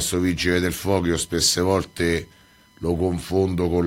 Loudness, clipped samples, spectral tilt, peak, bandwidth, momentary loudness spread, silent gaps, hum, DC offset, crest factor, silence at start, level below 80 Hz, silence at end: -22 LUFS; under 0.1%; -4 dB/octave; -4 dBFS; 16.5 kHz; 5 LU; none; none; under 0.1%; 18 dB; 0 s; -42 dBFS; 0 s